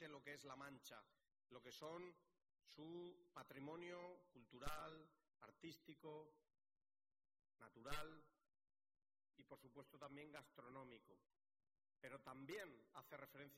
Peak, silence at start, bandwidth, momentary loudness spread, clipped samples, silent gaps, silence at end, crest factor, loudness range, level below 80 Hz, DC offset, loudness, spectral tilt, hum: -34 dBFS; 0 s; 15.5 kHz; 12 LU; under 0.1%; none; 0 s; 24 dB; 5 LU; -74 dBFS; under 0.1%; -59 LUFS; -4.5 dB/octave; none